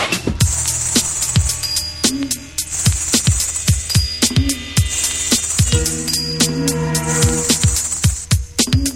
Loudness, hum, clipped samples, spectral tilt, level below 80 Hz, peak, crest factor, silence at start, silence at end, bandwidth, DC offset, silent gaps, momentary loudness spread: -16 LUFS; none; under 0.1%; -3 dB/octave; -28 dBFS; 0 dBFS; 16 dB; 0 s; 0 s; 17 kHz; under 0.1%; none; 4 LU